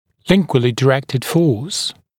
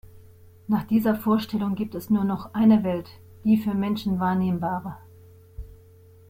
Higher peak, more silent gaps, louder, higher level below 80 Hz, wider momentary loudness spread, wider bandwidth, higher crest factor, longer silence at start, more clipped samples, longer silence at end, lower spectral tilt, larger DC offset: first, 0 dBFS vs -8 dBFS; neither; first, -17 LUFS vs -24 LUFS; about the same, -48 dBFS vs -52 dBFS; second, 5 LU vs 24 LU; about the same, 17.5 kHz vs 16 kHz; about the same, 16 dB vs 16 dB; about the same, 0.25 s vs 0.15 s; neither; second, 0.25 s vs 0.65 s; second, -5.5 dB/octave vs -8 dB/octave; neither